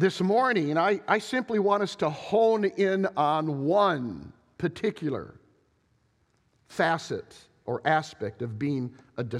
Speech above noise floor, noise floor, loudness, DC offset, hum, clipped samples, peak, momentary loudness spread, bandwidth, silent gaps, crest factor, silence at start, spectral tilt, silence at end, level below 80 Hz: 42 dB; -69 dBFS; -27 LUFS; under 0.1%; none; under 0.1%; -8 dBFS; 13 LU; 12.5 kHz; none; 20 dB; 0 s; -6 dB/octave; 0 s; -66 dBFS